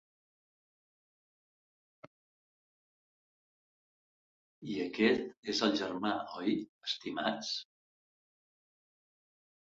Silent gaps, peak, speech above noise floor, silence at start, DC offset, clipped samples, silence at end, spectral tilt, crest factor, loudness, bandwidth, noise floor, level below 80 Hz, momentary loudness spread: 2.07-4.62 s, 5.37-5.43 s, 6.69-6.81 s; -16 dBFS; over 56 dB; 2.05 s; under 0.1%; under 0.1%; 2 s; -2.5 dB/octave; 24 dB; -34 LUFS; 7.6 kHz; under -90 dBFS; -78 dBFS; 9 LU